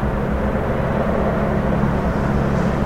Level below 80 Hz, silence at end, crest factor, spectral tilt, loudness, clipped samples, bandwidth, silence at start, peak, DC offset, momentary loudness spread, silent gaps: -26 dBFS; 0 s; 12 dB; -8.5 dB/octave; -20 LUFS; under 0.1%; 14 kHz; 0 s; -6 dBFS; 0.6%; 2 LU; none